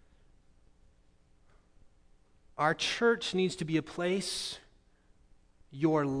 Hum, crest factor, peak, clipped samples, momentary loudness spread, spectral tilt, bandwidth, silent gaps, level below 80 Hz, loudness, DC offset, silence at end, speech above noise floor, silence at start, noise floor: none; 22 dB; -14 dBFS; under 0.1%; 13 LU; -4.5 dB/octave; 11 kHz; none; -64 dBFS; -31 LUFS; under 0.1%; 0 s; 33 dB; 2.55 s; -64 dBFS